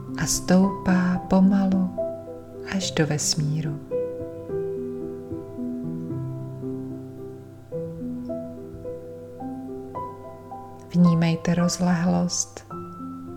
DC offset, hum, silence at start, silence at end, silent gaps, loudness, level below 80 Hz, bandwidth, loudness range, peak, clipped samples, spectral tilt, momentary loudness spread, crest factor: under 0.1%; none; 0 s; 0 s; none; -25 LUFS; -50 dBFS; 15.5 kHz; 12 LU; -6 dBFS; under 0.1%; -5.5 dB/octave; 18 LU; 18 dB